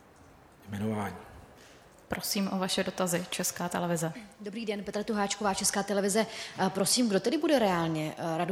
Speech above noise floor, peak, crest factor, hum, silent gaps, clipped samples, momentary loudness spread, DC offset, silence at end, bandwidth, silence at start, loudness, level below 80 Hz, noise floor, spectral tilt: 26 dB; -12 dBFS; 18 dB; none; none; under 0.1%; 11 LU; under 0.1%; 0 s; 17.5 kHz; 0.6 s; -30 LUFS; -62 dBFS; -56 dBFS; -4 dB/octave